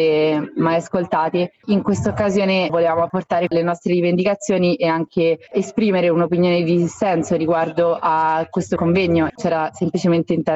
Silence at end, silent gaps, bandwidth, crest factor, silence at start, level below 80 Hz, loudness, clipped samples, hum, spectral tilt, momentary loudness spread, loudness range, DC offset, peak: 0 s; none; 8.2 kHz; 14 dB; 0 s; -52 dBFS; -18 LUFS; under 0.1%; none; -6.5 dB/octave; 4 LU; 1 LU; under 0.1%; -4 dBFS